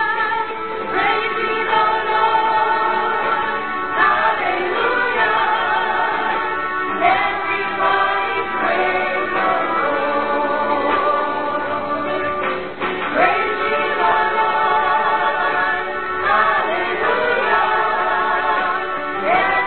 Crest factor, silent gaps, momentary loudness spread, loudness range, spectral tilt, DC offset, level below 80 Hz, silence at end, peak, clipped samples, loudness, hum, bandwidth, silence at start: 16 dB; none; 5 LU; 2 LU; -8.5 dB/octave; 1%; -52 dBFS; 0 s; -2 dBFS; under 0.1%; -18 LUFS; none; 4.5 kHz; 0 s